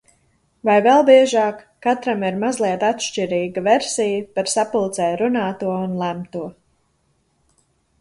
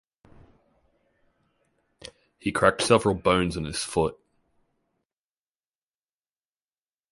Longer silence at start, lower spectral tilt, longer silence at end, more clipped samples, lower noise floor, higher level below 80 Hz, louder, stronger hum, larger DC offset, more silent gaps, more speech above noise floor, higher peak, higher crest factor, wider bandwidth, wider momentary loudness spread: second, 0.65 s vs 2.45 s; about the same, -4.5 dB/octave vs -4.5 dB/octave; second, 1.5 s vs 3 s; neither; second, -65 dBFS vs under -90 dBFS; second, -62 dBFS vs -50 dBFS; first, -19 LUFS vs -24 LUFS; neither; neither; neither; second, 47 dB vs over 67 dB; about the same, -2 dBFS vs -4 dBFS; second, 18 dB vs 26 dB; about the same, 11.5 kHz vs 11.5 kHz; second, 12 LU vs 25 LU